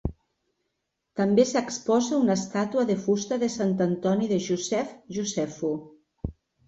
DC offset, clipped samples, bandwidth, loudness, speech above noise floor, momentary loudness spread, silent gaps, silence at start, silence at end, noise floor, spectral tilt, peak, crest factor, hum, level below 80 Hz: under 0.1%; under 0.1%; 8.2 kHz; -26 LUFS; 55 dB; 14 LU; none; 0.05 s; 0.35 s; -80 dBFS; -5.5 dB/octave; -8 dBFS; 18 dB; none; -48 dBFS